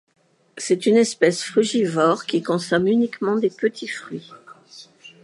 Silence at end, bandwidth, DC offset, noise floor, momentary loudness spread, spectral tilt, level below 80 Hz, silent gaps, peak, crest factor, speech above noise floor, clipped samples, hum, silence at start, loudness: 0.15 s; 11.5 kHz; under 0.1%; -47 dBFS; 14 LU; -4.5 dB/octave; -68 dBFS; none; -2 dBFS; 18 dB; 27 dB; under 0.1%; none; 0.55 s; -20 LUFS